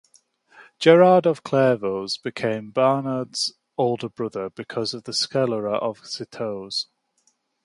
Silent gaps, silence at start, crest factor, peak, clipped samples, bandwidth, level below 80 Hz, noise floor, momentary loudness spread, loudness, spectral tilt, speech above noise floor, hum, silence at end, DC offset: none; 0.6 s; 22 dB; -2 dBFS; under 0.1%; 11.5 kHz; -68 dBFS; -67 dBFS; 14 LU; -22 LUFS; -5 dB/octave; 46 dB; none; 0.8 s; under 0.1%